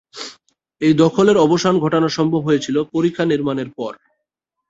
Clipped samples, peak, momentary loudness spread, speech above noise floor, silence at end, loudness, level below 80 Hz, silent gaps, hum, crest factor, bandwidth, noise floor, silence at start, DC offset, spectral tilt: under 0.1%; 0 dBFS; 16 LU; 62 dB; 0.8 s; -17 LUFS; -56 dBFS; none; none; 16 dB; 8 kHz; -78 dBFS; 0.15 s; under 0.1%; -6 dB/octave